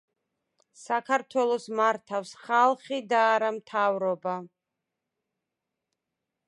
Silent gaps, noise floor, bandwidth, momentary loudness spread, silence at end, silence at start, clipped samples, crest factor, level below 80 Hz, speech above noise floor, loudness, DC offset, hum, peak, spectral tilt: none; -86 dBFS; 11.5 kHz; 10 LU; 2 s; 0.8 s; under 0.1%; 20 dB; -86 dBFS; 59 dB; -27 LUFS; under 0.1%; none; -8 dBFS; -4 dB/octave